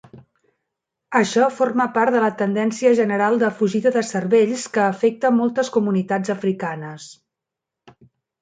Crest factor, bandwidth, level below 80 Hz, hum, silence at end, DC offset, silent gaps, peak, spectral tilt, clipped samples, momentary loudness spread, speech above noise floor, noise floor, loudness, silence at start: 16 dB; 9.4 kHz; -68 dBFS; none; 1.3 s; under 0.1%; none; -4 dBFS; -5.5 dB/octave; under 0.1%; 6 LU; 66 dB; -85 dBFS; -19 LUFS; 0.15 s